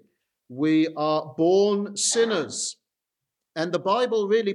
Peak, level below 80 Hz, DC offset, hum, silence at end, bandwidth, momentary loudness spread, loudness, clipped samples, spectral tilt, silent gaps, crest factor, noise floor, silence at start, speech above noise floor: -10 dBFS; -80 dBFS; under 0.1%; none; 0 s; 12 kHz; 10 LU; -23 LUFS; under 0.1%; -3.5 dB/octave; none; 14 dB; -85 dBFS; 0.5 s; 62 dB